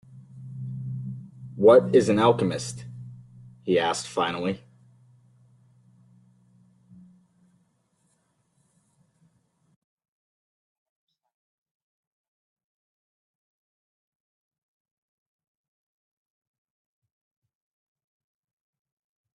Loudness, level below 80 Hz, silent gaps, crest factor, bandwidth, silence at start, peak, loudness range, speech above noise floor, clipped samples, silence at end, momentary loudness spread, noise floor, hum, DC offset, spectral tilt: -23 LUFS; -68 dBFS; none; 24 dB; 11.5 kHz; 0.15 s; -6 dBFS; 12 LU; 50 dB; under 0.1%; 14.8 s; 25 LU; -71 dBFS; none; under 0.1%; -5.5 dB/octave